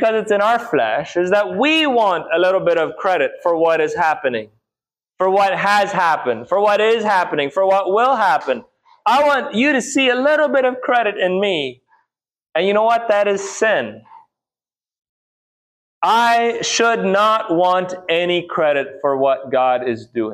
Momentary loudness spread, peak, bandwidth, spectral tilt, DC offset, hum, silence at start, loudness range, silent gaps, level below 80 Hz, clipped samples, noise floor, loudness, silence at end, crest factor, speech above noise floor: 6 LU; -4 dBFS; 15 kHz; -3.5 dB/octave; under 0.1%; none; 0 s; 4 LU; 15.09-16.01 s; -66 dBFS; under 0.1%; under -90 dBFS; -16 LUFS; 0 s; 14 dB; over 74 dB